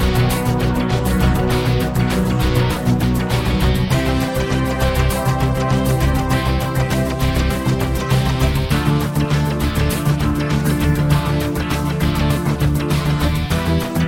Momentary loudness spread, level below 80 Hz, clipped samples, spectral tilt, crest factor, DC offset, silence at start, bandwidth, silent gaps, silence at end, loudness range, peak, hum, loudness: 2 LU; -24 dBFS; under 0.1%; -6 dB/octave; 14 dB; under 0.1%; 0 s; 17 kHz; none; 0 s; 1 LU; -2 dBFS; none; -18 LUFS